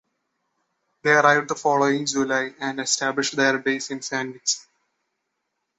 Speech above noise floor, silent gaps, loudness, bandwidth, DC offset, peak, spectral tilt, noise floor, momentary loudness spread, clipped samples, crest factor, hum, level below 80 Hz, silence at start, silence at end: 56 dB; none; -22 LUFS; 8.4 kHz; under 0.1%; -2 dBFS; -2.5 dB/octave; -78 dBFS; 10 LU; under 0.1%; 22 dB; none; -70 dBFS; 1.05 s; 1.2 s